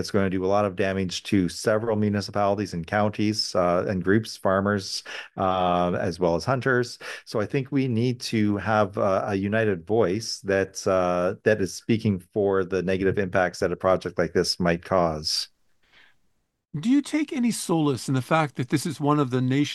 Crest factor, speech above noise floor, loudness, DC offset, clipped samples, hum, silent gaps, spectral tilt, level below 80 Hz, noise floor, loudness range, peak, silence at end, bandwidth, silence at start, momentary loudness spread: 18 dB; 47 dB; -24 LUFS; under 0.1%; under 0.1%; none; none; -5.5 dB/octave; -56 dBFS; -71 dBFS; 2 LU; -6 dBFS; 0 s; 12.5 kHz; 0 s; 4 LU